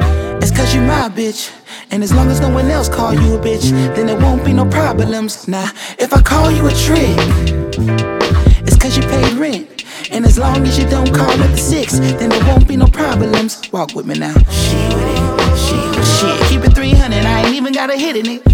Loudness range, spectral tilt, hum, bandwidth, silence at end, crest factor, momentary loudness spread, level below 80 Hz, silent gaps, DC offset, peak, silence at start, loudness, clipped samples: 2 LU; -5.5 dB/octave; none; 17 kHz; 0 s; 12 dB; 8 LU; -16 dBFS; none; under 0.1%; 0 dBFS; 0 s; -13 LUFS; under 0.1%